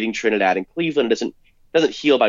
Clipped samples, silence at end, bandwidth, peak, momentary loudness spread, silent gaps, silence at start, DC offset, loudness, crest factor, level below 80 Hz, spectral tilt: under 0.1%; 0 s; 7.6 kHz; -4 dBFS; 5 LU; none; 0 s; under 0.1%; -20 LUFS; 14 dB; -60 dBFS; -4.5 dB/octave